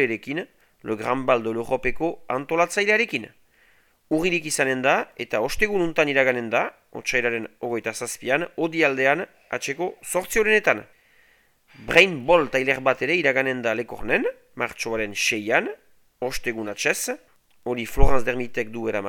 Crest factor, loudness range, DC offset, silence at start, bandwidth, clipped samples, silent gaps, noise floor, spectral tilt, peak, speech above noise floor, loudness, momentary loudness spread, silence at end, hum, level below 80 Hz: 24 dB; 5 LU; under 0.1%; 0 s; 18.5 kHz; under 0.1%; none; -60 dBFS; -3.5 dB/octave; 0 dBFS; 38 dB; -23 LUFS; 11 LU; 0 s; none; -36 dBFS